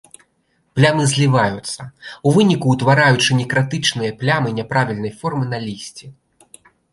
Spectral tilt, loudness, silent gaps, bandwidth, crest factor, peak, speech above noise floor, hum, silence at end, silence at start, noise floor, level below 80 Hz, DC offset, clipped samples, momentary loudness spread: -5 dB/octave; -17 LUFS; none; 11.5 kHz; 16 dB; -2 dBFS; 47 dB; none; 0.8 s; 0.75 s; -64 dBFS; -54 dBFS; under 0.1%; under 0.1%; 15 LU